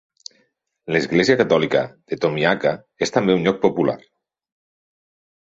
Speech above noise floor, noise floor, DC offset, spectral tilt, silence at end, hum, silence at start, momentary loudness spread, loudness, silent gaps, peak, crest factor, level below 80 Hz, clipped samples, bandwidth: 47 dB; -66 dBFS; under 0.1%; -5.5 dB/octave; 1.45 s; none; 0.85 s; 8 LU; -19 LUFS; none; -2 dBFS; 20 dB; -58 dBFS; under 0.1%; 8 kHz